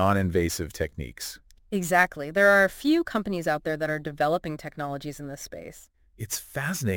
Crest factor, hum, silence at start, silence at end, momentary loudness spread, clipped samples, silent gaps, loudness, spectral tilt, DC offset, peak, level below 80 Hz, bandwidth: 20 dB; none; 0 s; 0 s; 17 LU; under 0.1%; none; -26 LUFS; -5 dB/octave; under 0.1%; -6 dBFS; -50 dBFS; 17 kHz